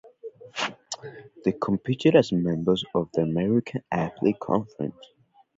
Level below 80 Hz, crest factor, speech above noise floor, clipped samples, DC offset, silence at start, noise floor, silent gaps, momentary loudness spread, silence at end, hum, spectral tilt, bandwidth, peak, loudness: -58 dBFS; 22 dB; 19 dB; under 0.1%; under 0.1%; 0.05 s; -44 dBFS; none; 17 LU; 0.55 s; none; -6.5 dB/octave; 8 kHz; -4 dBFS; -25 LUFS